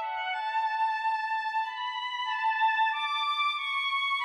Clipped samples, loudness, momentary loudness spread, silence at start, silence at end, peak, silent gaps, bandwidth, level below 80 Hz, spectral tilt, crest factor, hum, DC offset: under 0.1%; -28 LUFS; 6 LU; 0 s; 0 s; -18 dBFS; none; 11 kHz; -84 dBFS; 3 dB/octave; 12 dB; none; under 0.1%